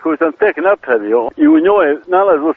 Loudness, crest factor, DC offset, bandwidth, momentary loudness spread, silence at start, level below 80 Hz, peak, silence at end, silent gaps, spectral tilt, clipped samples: -12 LUFS; 12 dB; under 0.1%; 3.7 kHz; 5 LU; 0 s; -54 dBFS; 0 dBFS; 0 s; none; -3.5 dB/octave; under 0.1%